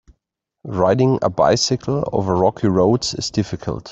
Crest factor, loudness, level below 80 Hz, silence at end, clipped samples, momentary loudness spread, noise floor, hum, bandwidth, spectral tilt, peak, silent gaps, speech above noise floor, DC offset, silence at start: 16 dB; -18 LUFS; -46 dBFS; 0 s; under 0.1%; 9 LU; -76 dBFS; none; 8.2 kHz; -5.5 dB/octave; -2 dBFS; none; 58 dB; under 0.1%; 0.65 s